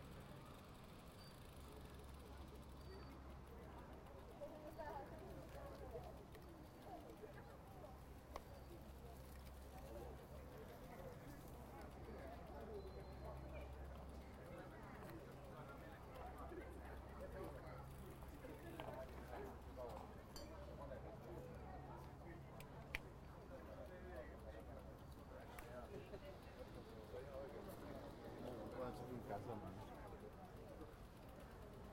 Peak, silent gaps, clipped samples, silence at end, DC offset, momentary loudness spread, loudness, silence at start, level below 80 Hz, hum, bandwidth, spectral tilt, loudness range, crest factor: -26 dBFS; none; under 0.1%; 0 s; under 0.1%; 6 LU; -56 LUFS; 0 s; -62 dBFS; none; 16 kHz; -6 dB/octave; 5 LU; 30 dB